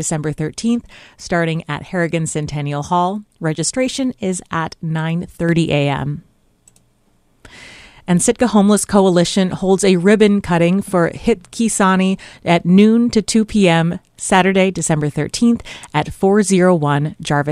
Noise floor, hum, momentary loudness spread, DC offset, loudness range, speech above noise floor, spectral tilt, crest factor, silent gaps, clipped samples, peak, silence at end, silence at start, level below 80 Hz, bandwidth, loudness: -57 dBFS; none; 10 LU; under 0.1%; 6 LU; 42 dB; -5.5 dB/octave; 16 dB; none; under 0.1%; 0 dBFS; 0 s; 0 s; -44 dBFS; 13.5 kHz; -16 LUFS